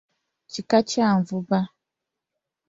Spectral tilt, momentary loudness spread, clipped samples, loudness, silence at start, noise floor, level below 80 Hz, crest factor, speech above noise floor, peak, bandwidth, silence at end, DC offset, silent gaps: -6 dB/octave; 14 LU; under 0.1%; -22 LUFS; 0.55 s; -85 dBFS; -64 dBFS; 20 dB; 63 dB; -4 dBFS; 7.8 kHz; 1 s; under 0.1%; none